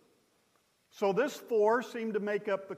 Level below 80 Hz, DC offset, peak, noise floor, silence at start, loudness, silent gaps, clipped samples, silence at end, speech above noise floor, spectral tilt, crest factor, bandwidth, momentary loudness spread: -88 dBFS; under 0.1%; -16 dBFS; -72 dBFS; 0.95 s; -31 LUFS; none; under 0.1%; 0 s; 41 dB; -5.5 dB/octave; 16 dB; 15.5 kHz; 6 LU